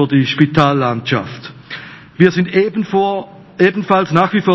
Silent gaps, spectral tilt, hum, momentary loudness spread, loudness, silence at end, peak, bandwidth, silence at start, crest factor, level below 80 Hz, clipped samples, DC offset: none; -7.5 dB/octave; none; 17 LU; -14 LUFS; 0 s; 0 dBFS; 8 kHz; 0 s; 14 dB; -52 dBFS; 0.3%; under 0.1%